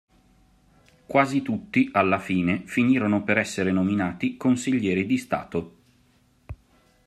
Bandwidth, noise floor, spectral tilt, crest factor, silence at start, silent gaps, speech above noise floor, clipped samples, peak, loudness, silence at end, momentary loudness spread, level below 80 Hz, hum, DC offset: 13 kHz; -62 dBFS; -6 dB/octave; 20 dB; 1.1 s; none; 38 dB; under 0.1%; -6 dBFS; -24 LUFS; 0.55 s; 11 LU; -58 dBFS; none; under 0.1%